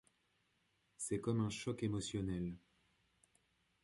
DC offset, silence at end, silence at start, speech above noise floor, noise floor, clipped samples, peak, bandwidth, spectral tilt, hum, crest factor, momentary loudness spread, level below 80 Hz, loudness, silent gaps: under 0.1%; 1.25 s; 1 s; 40 dB; -80 dBFS; under 0.1%; -24 dBFS; 11.5 kHz; -5.5 dB/octave; none; 20 dB; 8 LU; -64 dBFS; -41 LUFS; none